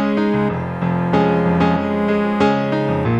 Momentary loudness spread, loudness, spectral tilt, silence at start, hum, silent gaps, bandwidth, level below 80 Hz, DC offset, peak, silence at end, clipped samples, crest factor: 4 LU; -17 LUFS; -8.5 dB/octave; 0 s; none; none; 7.6 kHz; -44 dBFS; under 0.1%; -2 dBFS; 0 s; under 0.1%; 14 dB